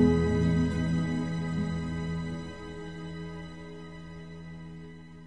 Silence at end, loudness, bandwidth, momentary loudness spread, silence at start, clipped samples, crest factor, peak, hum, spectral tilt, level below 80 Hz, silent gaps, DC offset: 0 s; -31 LUFS; 9.8 kHz; 18 LU; 0 s; under 0.1%; 20 dB; -10 dBFS; none; -7.5 dB/octave; -44 dBFS; none; 0.3%